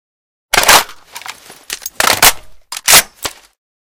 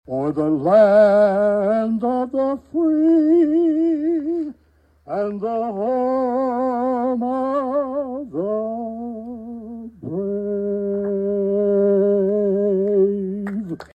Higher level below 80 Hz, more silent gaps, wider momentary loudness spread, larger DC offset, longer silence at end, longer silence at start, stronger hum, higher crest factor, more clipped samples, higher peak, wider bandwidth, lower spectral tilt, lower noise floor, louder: first, -40 dBFS vs -56 dBFS; neither; first, 22 LU vs 13 LU; neither; first, 0.55 s vs 0.15 s; first, 0.55 s vs 0.1 s; neither; about the same, 14 dB vs 16 dB; first, 1% vs under 0.1%; first, 0 dBFS vs -4 dBFS; first, over 20 kHz vs 8.4 kHz; second, 0.5 dB/octave vs -9.5 dB/octave; second, -33 dBFS vs -57 dBFS; first, -9 LUFS vs -19 LUFS